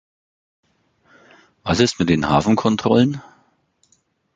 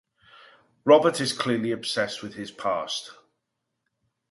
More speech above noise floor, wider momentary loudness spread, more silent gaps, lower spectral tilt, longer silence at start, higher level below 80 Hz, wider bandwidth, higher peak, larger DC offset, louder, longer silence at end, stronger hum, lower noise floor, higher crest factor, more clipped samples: second, 46 dB vs 56 dB; second, 8 LU vs 15 LU; neither; first, -5.5 dB/octave vs -4 dB/octave; first, 1.65 s vs 0.85 s; first, -44 dBFS vs -70 dBFS; second, 9.2 kHz vs 11.5 kHz; about the same, -2 dBFS vs -4 dBFS; neither; first, -18 LUFS vs -24 LUFS; about the same, 1.15 s vs 1.2 s; neither; second, -63 dBFS vs -81 dBFS; about the same, 20 dB vs 22 dB; neither